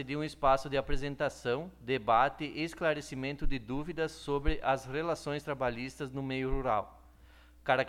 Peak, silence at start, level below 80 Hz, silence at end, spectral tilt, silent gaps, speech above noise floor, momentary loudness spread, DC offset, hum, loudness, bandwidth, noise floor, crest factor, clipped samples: -12 dBFS; 0 s; -42 dBFS; 0 s; -5.5 dB/octave; none; 25 dB; 10 LU; under 0.1%; none; -34 LUFS; 13 kHz; -58 dBFS; 20 dB; under 0.1%